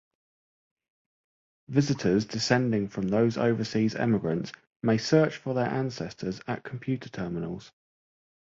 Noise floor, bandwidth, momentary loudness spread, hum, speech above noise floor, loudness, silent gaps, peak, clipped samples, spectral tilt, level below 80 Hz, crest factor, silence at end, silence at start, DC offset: under -90 dBFS; 7.8 kHz; 11 LU; none; over 63 dB; -28 LUFS; 4.67-4.80 s; -6 dBFS; under 0.1%; -6 dB/octave; -60 dBFS; 22 dB; 0.75 s; 1.7 s; under 0.1%